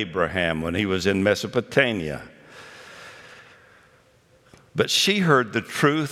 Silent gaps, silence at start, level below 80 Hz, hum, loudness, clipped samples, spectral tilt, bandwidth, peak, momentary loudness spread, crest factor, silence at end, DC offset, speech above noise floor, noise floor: none; 0 s; -56 dBFS; none; -22 LUFS; under 0.1%; -4.5 dB/octave; 16.5 kHz; -2 dBFS; 23 LU; 22 dB; 0 s; under 0.1%; 36 dB; -58 dBFS